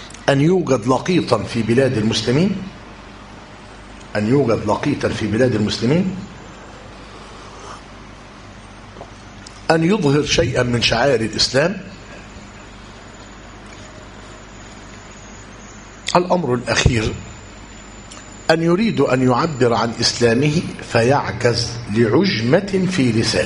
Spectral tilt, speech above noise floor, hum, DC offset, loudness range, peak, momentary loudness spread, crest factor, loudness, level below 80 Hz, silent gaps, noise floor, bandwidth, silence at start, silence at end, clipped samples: -5 dB/octave; 22 dB; none; under 0.1%; 17 LU; 0 dBFS; 22 LU; 20 dB; -17 LUFS; -40 dBFS; none; -38 dBFS; 11 kHz; 0 s; 0 s; under 0.1%